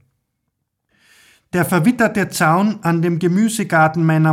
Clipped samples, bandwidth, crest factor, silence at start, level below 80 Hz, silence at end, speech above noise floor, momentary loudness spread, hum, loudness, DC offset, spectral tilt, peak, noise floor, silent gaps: under 0.1%; 16 kHz; 14 dB; 1.55 s; -56 dBFS; 0 s; 58 dB; 3 LU; none; -16 LUFS; under 0.1%; -6 dB/octave; -4 dBFS; -74 dBFS; none